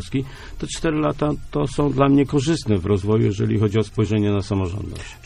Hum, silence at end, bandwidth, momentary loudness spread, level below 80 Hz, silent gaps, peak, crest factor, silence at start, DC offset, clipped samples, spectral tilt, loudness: none; 0.1 s; 11.5 kHz; 11 LU; -38 dBFS; none; -4 dBFS; 16 dB; 0 s; under 0.1%; under 0.1%; -7 dB/octave; -21 LUFS